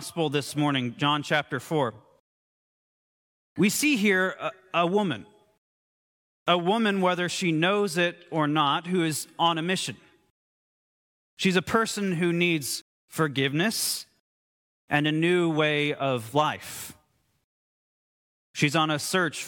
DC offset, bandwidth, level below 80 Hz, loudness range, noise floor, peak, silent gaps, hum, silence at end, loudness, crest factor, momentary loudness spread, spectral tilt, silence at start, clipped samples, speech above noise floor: under 0.1%; 17.5 kHz; -70 dBFS; 4 LU; under -90 dBFS; -6 dBFS; 2.20-3.56 s, 5.58-6.46 s, 10.30-11.37 s, 12.81-13.08 s, 14.20-14.88 s, 17.44-18.54 s; none; 0 s; -25 LUFS; 20 dB; 9 LU; -4.5 dB/octave; 0 s; under 0.1%; over 65 dB